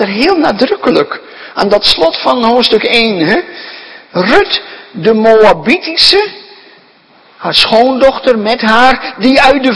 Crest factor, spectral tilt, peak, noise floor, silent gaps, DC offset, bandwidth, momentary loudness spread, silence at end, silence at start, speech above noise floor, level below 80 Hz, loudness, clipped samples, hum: 10 dB; -4 dB/octave; 0 dBFS; -44 dBFS; none; under 0.1%; 11 kHz; 13 LU; 0 s; 0 s; 35 dB; -40 dBFS; -9 LUFS; 2%; none